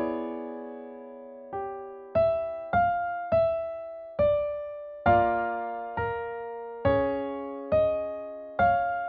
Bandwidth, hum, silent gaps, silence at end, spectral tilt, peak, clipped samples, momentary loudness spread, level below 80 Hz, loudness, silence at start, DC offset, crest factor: 4.8 kHz; none; none; 0 s; -6 dB/octave; -10 dBFS; under 0.1%; 14 LU; -52 dBFS; -28 LUFS; 0 s; under 0.1%; 18 dB